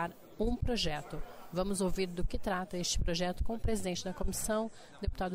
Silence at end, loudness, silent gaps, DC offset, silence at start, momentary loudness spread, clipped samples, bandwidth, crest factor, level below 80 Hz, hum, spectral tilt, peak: 0 s; -36 LUFS; none; under 0.1%; 0 s; 8 LU; under 0.1%; 16 kHz; 12 dB; -40 dBFS; none; -4.5 dB/octave; -22 dBFS